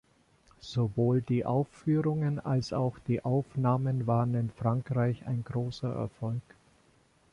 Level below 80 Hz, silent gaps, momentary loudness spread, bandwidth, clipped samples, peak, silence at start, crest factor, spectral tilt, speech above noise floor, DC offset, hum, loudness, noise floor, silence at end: -60 dBFS; none; 7 LU; 7.4 kHz; under 0.1%; -14 dBFS; 0.65 s; 16 dB; -8.5 dB/octave; 36 dB; under 0.1%; none; -31 LUFS; -65 dBFS; 0.9 s